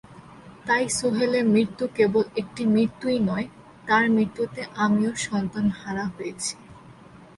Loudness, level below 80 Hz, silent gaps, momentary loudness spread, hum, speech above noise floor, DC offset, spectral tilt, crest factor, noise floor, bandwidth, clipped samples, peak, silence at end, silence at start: -24 LUFS; -58 dBFS; none; 10 LU; none; 24 dB; under 0.1%; -5 dB/octave; 16 dB; -47 dBFS; 11.5 kHz; under 0.1%; -8 dBFS; 0.15 s; 0.1 s